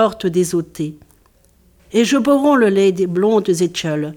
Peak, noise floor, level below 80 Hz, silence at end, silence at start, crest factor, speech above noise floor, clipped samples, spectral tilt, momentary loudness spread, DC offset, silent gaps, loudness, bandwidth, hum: -2 dBFS; -54 dBFS; -54 dBFS; 0 s; 0 s; 14 dB; 38 dB; under 0.1%; -5.5 dB/octave; 9 LU; under 0.1%; none; -16 LUFS; 18 kHz; none